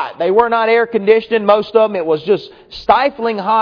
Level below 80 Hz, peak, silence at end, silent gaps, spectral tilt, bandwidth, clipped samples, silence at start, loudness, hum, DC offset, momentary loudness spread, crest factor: -50 dBFS; 0 dBFS; 0 s; none; -7 dB/octave; 5.4 kHz; under 0.1%; 0 s; -14 LUFS; none; under 0.1%; 6 LU; 14 dB